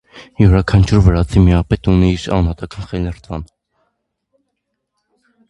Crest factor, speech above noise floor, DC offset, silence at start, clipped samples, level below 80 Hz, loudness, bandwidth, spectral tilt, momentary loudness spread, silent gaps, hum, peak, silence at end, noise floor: 16 dB; 60 dB; under 0.1%; 0.15 s; under 0.1%; -24 dBFS; -14 LUFS; 9.2 kHz; -8 dB/octave; 16 LU; none; none; 0 dBFS; 2.05 s; -73 dBFS